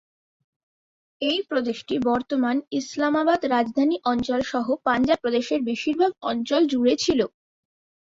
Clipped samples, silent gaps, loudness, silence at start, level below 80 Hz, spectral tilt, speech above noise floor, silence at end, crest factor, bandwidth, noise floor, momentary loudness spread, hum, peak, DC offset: under 0.1%; none; -23 LUFS; 1.2 s; -58 dBFS; -4 dB/octave; over 67 dB; 0.85 s; 16 dB; 7.8 kHz; under -90 dBFS; 5 LU; none; -8 dBFS; under 0.1%